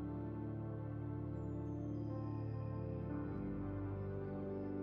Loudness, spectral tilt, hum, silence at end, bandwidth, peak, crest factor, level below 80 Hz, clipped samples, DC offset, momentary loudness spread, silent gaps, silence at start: -44 LUFS; -10.5 dB/octave; none; 0 s; 5.2 kHz; -32 dBFS; 10 dB; -56 dBFS; under 0.1%; under 0.1%; 1 LU; none; 0 s